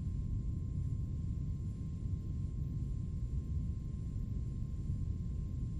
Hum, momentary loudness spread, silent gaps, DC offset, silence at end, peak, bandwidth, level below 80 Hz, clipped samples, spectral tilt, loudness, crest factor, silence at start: none; 2 LU; none; under 0.1%; 0 s; -26 dBFS; 8.2 kHz; -42 dBFS; under 0.1%; -9.5 dB/octave; -40 LUFS; 12 dB; 0 s